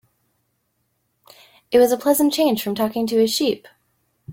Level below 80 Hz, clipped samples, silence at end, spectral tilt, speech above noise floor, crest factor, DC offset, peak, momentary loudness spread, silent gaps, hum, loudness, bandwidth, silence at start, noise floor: -62 dBFS; under 0.1%; 0 s; -4 dB/octave; 52 dB; 18 dB; under 0.1%; -4 dBFS; 6 LU; none; none; -19 LUFS; 17 kHz; 1.7 s; -70 dBFS